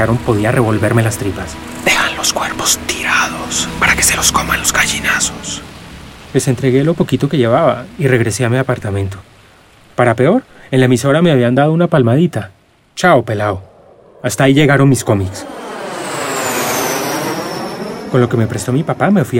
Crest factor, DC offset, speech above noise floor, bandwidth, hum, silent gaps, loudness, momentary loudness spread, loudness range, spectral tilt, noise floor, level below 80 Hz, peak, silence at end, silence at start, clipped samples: 14 dB; under 0.1%; 31 dB; 16.5 kHz; none; none; -14 LUFS; 13 LU; 3 LU; -4.5 dB/octave; -44 dBFS; -38 dBFS; 0 dBFS; 0 s; 0 s; under 0.1%